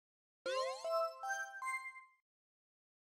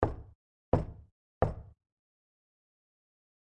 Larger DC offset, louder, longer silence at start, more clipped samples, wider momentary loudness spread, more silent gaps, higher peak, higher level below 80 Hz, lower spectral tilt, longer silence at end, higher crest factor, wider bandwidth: neither; second, -41 LUFS vs -35 LUFS; first, 0.45 s vs 0 s; neither; second, 10 LU vs 16 LU; second, none vs 0.35-0.72 s, 1.12-1.41 s; second, -28 dBFS vs -8 dBFS; second, under -90 dBFS vs -48 dBFS; second, 0.5 dB/octave vs -10 dB/octave; second, 1.15 s vs 1.85 s; second, 16 dB vs 30 dB; first, 16 kHz vs 8.2 kHz